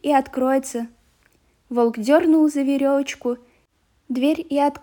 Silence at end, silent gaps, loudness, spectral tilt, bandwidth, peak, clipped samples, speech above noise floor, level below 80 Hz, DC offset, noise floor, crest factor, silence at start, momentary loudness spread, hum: 0.05 s; none; -20 LUFS; -4.5 dB/octave; over 20 kHz; -4 dBFS; under 0.1%; 44 dB; -62 dBFS; under 0.1%; -64 dBFS; 16 dB; 0.05 s; 13 LU; none